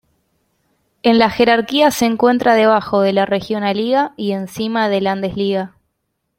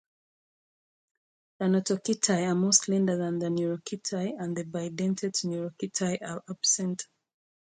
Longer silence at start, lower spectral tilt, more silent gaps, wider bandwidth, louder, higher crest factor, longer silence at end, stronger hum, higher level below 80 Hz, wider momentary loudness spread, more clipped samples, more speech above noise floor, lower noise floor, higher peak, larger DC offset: second, 1.05 s vs 1.6 s; about the same, -5 dB/octave vs -4 dB/octave; neither; first, 16.5 kHz vs 9.6 kHz; first, -15 LUFS vs -28 LUFS; second, 16 dB vs 22 dB; about the same, 0.7 s vs 0.75 s; neither; first, -54 dBFS vs -74 dBFS; second, 8 LU vs 11 LU; neither; second, 57 dB vs over 61 dB; second, -72 dBFS vs under -90 dBFS; first, 0 dBFS vs -8 dBFS; neither